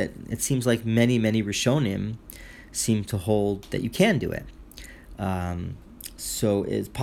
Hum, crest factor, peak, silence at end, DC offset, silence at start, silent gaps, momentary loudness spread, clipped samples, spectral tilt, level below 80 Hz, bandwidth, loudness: none; 20 dB; -6 dBFS; 0 s; under 0.1%; 0 s; none; 20 LU; under 0.1%; -5 dB/octave; -46 dBFS; 17.5 kHz; -25 LUFS